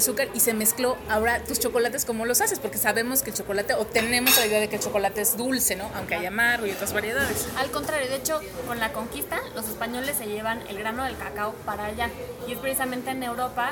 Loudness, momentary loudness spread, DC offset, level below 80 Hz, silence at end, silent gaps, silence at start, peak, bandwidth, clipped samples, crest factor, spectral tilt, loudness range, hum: -25 LUFS; 9 LU; under 0.1%; -48 dBFS; 0 s; none; 0 s; -2 dBFS; 19 kHz; under 0.1%; 24 dB; -2 dB/octave; 7 LU; none